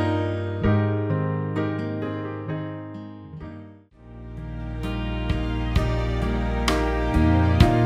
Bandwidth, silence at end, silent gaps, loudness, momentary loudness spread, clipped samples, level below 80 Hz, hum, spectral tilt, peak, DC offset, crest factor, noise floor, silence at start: 14.5 kHz; 0 s; none; -25 LUFS; 18 LU; under 0.1%; -30 dBFS; none; -7 dB/octave; -2 dBFS; under 0.1%; 20 dB; -46 dBFS; 0 s